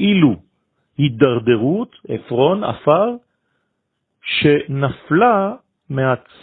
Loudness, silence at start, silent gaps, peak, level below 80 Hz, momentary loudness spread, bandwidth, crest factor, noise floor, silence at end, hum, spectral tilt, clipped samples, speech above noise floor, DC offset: -17 LUFS; 0 s; none; 0 dBFS; -52 dBFS; 14 LU; 4.5 kHz; 18 dB; -73 dBFS; 0.25 s; none; -10.5 dB/octave; under 0.1%; 57 dB; under 0.1%